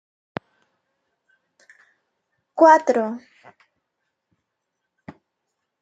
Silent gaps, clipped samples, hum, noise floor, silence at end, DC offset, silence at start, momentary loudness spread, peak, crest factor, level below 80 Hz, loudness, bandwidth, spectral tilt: none; under 0.1%; none; -79 dBFS; 2.65 s; under 0.1%; 2.55 s; 23 LU; -2 dBFS; 24 dB; -78 dBFS; -17 LUFS; 7.8 kHz; -5 dB/octave